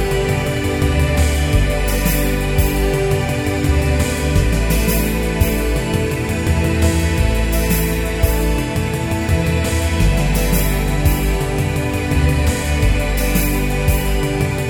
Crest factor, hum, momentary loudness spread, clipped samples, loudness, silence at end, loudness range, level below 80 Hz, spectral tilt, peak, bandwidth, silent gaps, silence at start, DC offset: 14 dB; none; 3 LU; under 0.1%; -17 LUFS; 0 s; 1 LU; -20 dBFS; -5.5 dB/octave; -2 dBFS; 19 kHz; none; 0 s; under 0.1%